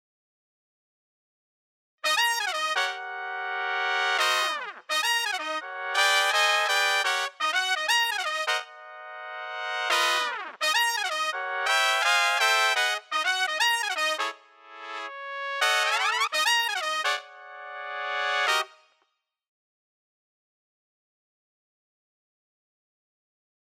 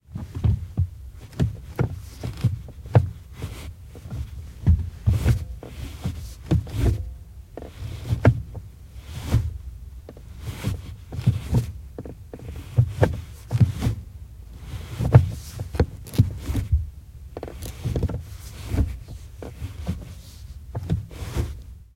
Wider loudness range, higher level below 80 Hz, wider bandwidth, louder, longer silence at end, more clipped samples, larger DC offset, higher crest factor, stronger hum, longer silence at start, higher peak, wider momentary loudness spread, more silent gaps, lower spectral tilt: about the same, 6 LU vs 7 LU; second, under -90 dBFS vs -34 dBFS; about the same, 16.5 kHz vs 16 kHz; about the same, -24 LUFS vs -26 LUFS; first, 4.95 s vs 0.1 s; neither; neither; about the same, 22 dB vs 26 dB; neither; first, 2.05 s vs 0.1 s; second, -6 dBFS vs 0 dBFS; second, 14 LU vs 19 LU; neither; second, 4.5 dB/octave vs -7.5 dB/octave